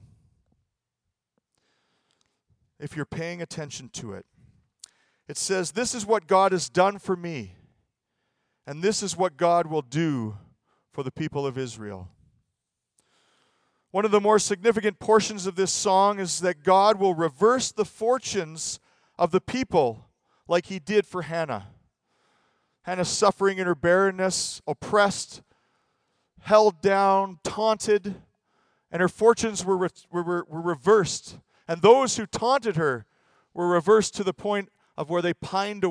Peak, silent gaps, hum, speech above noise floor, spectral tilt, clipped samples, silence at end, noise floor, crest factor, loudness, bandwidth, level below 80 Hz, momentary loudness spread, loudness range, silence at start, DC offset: -2 dBFS; none; none; 60 dB; -4 dB/octave; under 0.1%; 0 s; -84 dBFS; 22 dB; -24 LUFS; 10.5 kHz; -62 dBFS; 16 LU; 12 LU; 2.8 s; under 0.1%